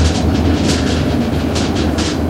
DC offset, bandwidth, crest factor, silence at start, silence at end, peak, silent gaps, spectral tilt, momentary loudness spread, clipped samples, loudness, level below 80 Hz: under 0.1%; 15.5 kHz; 14 dB; 0 s; 0 s; -2 dBFS; none; -5.5 dB/octave; 2 LU; under 0.1%; -15 LUFS; -22 dBFS